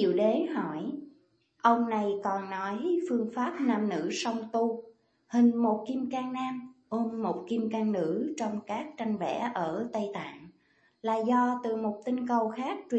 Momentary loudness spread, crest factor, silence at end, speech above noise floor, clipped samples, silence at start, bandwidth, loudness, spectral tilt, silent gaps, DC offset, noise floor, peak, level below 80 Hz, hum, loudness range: 10 LU; 20 dB; 0 s; 38 dB; under 0.1%; 0 s; 8.4 kHz; -30 LUFS; -6 dB/octave; none; under 0.1%; -68 dBFS; -10 dBFS; -78 dBFS; none; 3 LU